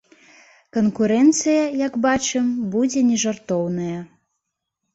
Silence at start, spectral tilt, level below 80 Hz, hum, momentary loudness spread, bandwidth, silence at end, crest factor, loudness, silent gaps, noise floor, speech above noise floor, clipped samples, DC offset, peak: 0.75 s; -4.5 dB/octave; -58 dBFS; none; 10 LU; 8.2 kHz; 0.9 s; 16 dB; -20 LUFS; none; -79 dBFS; 60 dB; under 0.1%; under 0.1%; -6 dBFS